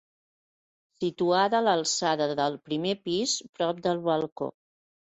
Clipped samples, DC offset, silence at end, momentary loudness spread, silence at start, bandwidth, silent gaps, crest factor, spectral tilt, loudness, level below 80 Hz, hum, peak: under 0.1%; under 0.1%; 0.65 s; 10 LU; 1 s; 8.2 kHz; 3.49-3.53 s, 4.32-4.36 s; 18 dB; -3.5 dB/octave; -27 LUFS; -72 dBFS; none; -12 dBFS